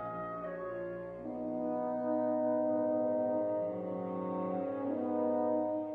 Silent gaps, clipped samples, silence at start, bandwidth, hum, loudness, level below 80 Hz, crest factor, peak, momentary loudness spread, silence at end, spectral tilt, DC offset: none; under 0.1%; 0 s; 3.8 kHz; none; -35 LUFS; -72 dBFS; 12 dB; -22 dBFS; 8 LU; 0 s; -10.5 dB/octave; under 0.1%